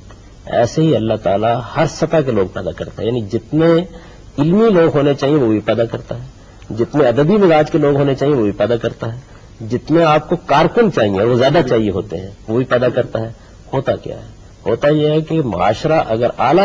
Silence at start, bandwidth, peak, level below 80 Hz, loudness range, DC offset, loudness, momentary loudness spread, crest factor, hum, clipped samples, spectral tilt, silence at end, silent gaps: 0.05 s; 7.6 kHz; 0 dBFS; -40 dBFS; 3 LU; under 0.1%; -15 LUFS; 14 LU; 14 dB; none; under 0.1%; -7 dB/octave; 0 s; none